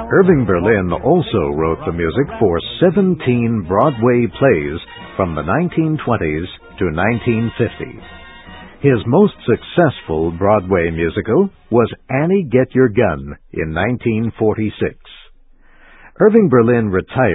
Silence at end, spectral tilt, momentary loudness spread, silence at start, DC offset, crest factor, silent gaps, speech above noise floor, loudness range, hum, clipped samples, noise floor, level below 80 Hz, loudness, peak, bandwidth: 0 s; -12 dB/octave; 10 LU; 0 s; under 0.1%; 16 dB; none; 30 dB; 3 LU; none; under 0.1%; -45 dBFS; -36 dBFS; -16 LUFS; 0 dBFS; 4 kHz